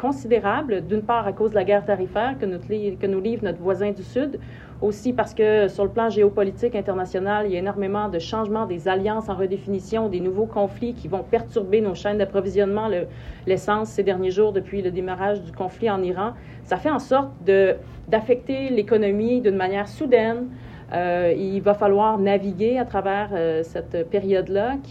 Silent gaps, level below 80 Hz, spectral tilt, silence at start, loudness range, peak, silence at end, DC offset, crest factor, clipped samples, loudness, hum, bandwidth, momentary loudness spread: none; -46 dBFS; -7 dB/octave; 0 s; 3 LU; -4 dBFS; 0 s; under 0.1%; 18 dB; under 0.1%; -23 LUFS; none; 8.6 kHz; 8 LU